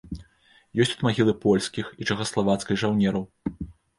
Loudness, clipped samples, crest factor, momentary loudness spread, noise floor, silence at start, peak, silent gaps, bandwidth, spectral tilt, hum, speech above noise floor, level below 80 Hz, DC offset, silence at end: -25 LUFS; under 0.1%; 18 dB; 12 LU; -59 dBFS; 0.05 s; -8 dBFS; none; 11.5 kHz; -5.5 dB/octave; none; 36 dB; -50 dBFS; under 0.1%; 0.25 s